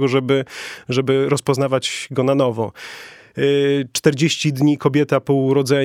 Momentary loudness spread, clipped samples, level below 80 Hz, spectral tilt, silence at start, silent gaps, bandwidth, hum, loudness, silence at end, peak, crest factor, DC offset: 12 LU; under 0.1%; -62 dBFS; -5.5 dB/octave; 0 s; none; 16 kHz; none; -18 LUFS; 0 s; -2 dBFS; 16 dB; under 0.1%